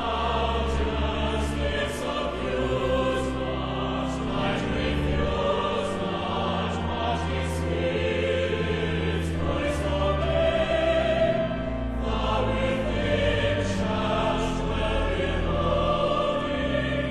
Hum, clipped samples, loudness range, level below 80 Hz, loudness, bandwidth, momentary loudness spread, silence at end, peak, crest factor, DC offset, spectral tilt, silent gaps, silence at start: none; under 0.1%; 2 LU; -34 dBFS; -26 LUFS; 12.5 kHz; 5 LU; 0 s; -10 dBFS; 16 dB; under 0.1%; -6 dB/octave; none; 0 s